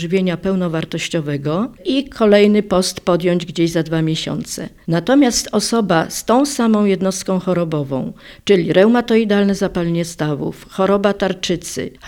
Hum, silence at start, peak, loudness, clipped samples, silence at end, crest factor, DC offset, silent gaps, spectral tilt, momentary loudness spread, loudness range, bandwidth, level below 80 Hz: none; 0 s; 0 dBFS; -17 LUFS; under 0.1%; 0 s; 16 dB; under 0.1%; none; -5 dB/octave; 9 LU; 1 LU; 17 kHz; -46 dBFS